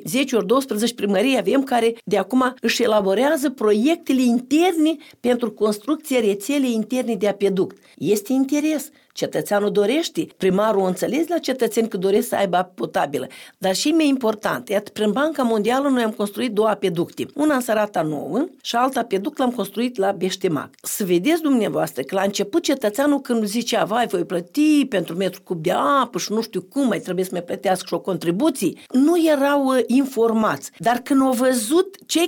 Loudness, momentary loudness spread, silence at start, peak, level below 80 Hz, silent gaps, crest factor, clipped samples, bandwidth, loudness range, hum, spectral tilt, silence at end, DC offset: -20 LUFS; 7 LU; 0 s; -4 dBFS; -66 dBFS; none; 16 dB; under 0.1%; 18 kHz; 3 LU; none; -4.5 dB/octave; 0 s; under 0.1%